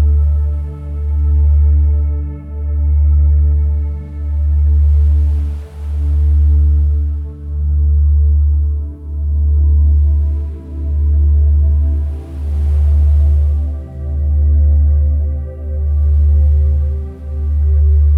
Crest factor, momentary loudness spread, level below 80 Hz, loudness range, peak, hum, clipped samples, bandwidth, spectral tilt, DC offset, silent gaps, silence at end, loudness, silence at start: 6 dB; 11 LU; -12 dBFS; 1 LU; -6 dBFS; none; under 0.1%; 1.4 kHz; -11 dB/octave; under 0.1%; none; 0 s; -15 LUFS; 0 s